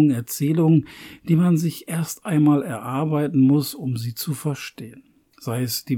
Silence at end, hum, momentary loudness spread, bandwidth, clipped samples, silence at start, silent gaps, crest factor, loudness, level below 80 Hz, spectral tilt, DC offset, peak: 0 s; none; 16 LU; 18.5 kHz; under 0.1%; 0 s; none; 14 dB; -21 LUFS; -64 dBFS; -6.5 dB/octave; under 0.1%; -8 dBFS